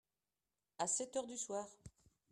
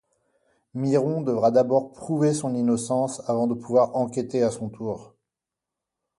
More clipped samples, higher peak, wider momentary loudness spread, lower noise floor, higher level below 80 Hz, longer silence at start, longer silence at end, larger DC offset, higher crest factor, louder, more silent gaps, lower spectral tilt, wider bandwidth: neither; second, -26 dBFS vs -8 dBFS; first, 15 LU vs 11 LU; about the same, under -90 dBFS vs -87 dBFS; second, -76 dBFS vs -64 dBFS; about the same, 0.8 s vs 0.75 s; second, 0.4 s vs 1.15 s; neither; about the same, 20 dB vs 16 dB; second, -42 LUFS vs -24 LUFS; neither; second, -2 dB/octave vs -7 dB/octave; first, 13 kHz vs 11.5 kHz